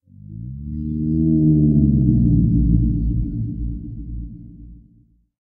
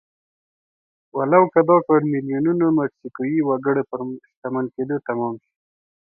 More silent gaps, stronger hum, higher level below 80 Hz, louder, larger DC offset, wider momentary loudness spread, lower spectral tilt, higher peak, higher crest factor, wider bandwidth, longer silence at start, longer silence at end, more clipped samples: second, none vs 4.37-4.42 s; neither; first, -26 dBFS vs -66 dBFS; about the same, -18 LUFS vs -20 LUFS; neither; first, 19 LU vs 14 LU; first, -17.5 dB/octave vs -14 dB/octave; about the same, -2 dBFS vs -2 dBFS; about the same, 16 dB vs 20 dB; second, 0.7 kHz vs 2.6 kHz; second, 0.3 s vs 1.15 s; about the same, 0.75 s vs 0.65 s; neither